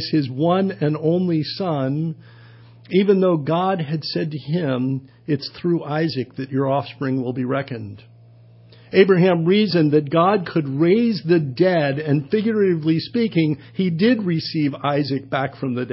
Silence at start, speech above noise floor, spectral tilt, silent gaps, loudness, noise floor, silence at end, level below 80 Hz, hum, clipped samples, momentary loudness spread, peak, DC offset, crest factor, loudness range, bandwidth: 0 s; 28 dB; -11.5 dB/octave; none; -20 LUFS; -47 dBFS; 0 s; -62 dBFS; none; under 0.1%; 9 LU; -2 dBFS; under 0.1%; 18 dB; 6 LU; 5.8 kHz